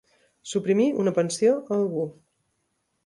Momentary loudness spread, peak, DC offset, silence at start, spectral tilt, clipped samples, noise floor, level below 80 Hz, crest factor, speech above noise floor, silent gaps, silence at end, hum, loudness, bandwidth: 9 LU; -10 dBFS; under 0.1%; 0.45 s; -5.5 dB/octave; under 0.1%; -75 dBFS; -70 dBFS; 16 dB; 51 dB; none; 0.95 s; none; -24 LUFS; 11.5 kHz